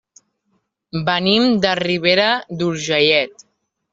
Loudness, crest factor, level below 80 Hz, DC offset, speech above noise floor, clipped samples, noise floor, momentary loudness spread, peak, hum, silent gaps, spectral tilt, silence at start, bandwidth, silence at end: -16 LUFS; 18 dB; -58 dBFS; under 0.1%; 51 dB; under 0.1%; -68 dBFS; 9 LU; -2 dBFS; none; none; -4.5 dB/octave; 0.95 s; 7.8 kHz; 0.65 s